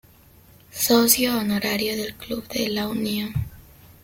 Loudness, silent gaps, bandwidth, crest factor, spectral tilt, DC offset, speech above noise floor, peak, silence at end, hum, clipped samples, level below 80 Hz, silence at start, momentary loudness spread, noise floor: -22 LUFS; none; 17 kHz; 22 dB; -3.5 dB/octave; under 0.1%; 29 dB; -2 dBFS; 0.4 s; none; under 0.1%; -48 dBFS; 0.75 s; 14 LU; -52 dBFS